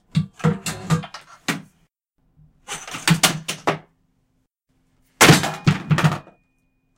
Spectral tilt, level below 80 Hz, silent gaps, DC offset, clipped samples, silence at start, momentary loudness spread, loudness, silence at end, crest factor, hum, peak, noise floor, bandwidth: -4 dB/octave; -52 dBFS; none; under 0.1%; under 0.1%; 0.15 s; 19 LU; -19 LUFS; 0.75 s; 22 dB; none; 0 dBFS; -68 dBFS; 17 kHz